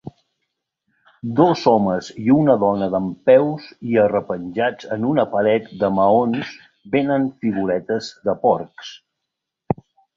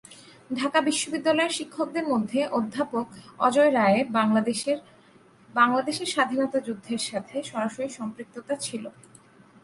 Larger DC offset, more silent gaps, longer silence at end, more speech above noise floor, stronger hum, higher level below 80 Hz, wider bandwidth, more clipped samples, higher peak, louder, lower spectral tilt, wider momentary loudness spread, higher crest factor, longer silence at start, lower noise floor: neither; neither; second, 0.45 s vs 0.75 s; first, 63 dB vs 30 dB; neither; first, -56 dBFS vs -70 dBFS; second, 7.4 kHz vs 11.5 kHz; neither; first, -2 dBFS vs -6 dBFS; first, -19 LUFS vs -25 LUFS; first, -7.5 dB/octave vs -4 dB/octave; about the same, 12 LU vs 12 LU; about the same, 18 dB vs 20 dB; about the same, 0.05 s vs 0.1 s; first, -81 dBFS vs -55 dBFS